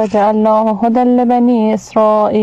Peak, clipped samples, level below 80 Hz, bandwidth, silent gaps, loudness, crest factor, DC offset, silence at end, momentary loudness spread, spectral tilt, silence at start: -4 dBFS; under 0.1%; -50 dBFS; 8 kHz; none; -12 LUFS; 8 dB; under 0.1%; 0 s; 2 LU; -7.5 dB/octave; 0 s